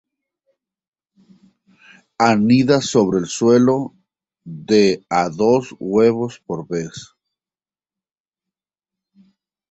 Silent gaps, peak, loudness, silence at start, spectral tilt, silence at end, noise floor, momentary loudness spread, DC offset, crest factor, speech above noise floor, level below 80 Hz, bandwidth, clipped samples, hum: none; -2 dBFS; -17 LUFS; 2.2 s; -5.5 dB/octave; 2.65 s; under -90 dBFS; 16 LU; under 0.1%; 18 dB; over 74 dB; -58 dBFS; 8.2 kHz; under 0.1%; none